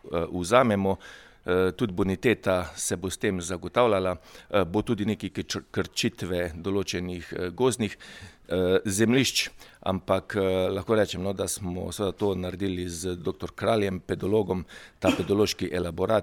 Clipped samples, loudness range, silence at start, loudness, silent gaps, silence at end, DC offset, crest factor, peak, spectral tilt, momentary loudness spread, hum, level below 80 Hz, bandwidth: under 0.1%; 3 LU; 0.05 s; -27 LUFS; none; 0 s; under 0.1%; 22 dB; -6 dBFS; -5 dB/octave; 10 LU; none; -52 dBFS; 18.5 kHz